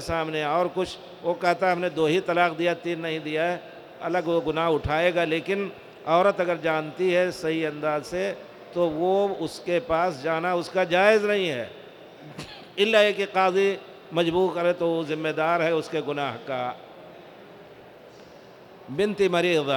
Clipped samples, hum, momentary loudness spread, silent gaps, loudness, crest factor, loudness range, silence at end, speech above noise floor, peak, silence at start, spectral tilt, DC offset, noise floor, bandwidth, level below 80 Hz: under 0.1%; none; 14 LU; none; -25 LUFS; 20 dB; 5 LU; 0 s; 23 dB; -6 dBFS; 0 s; -5.5 dB/octave; under 0.1%; -48 dBFS; 19 kHz; -56 dBFS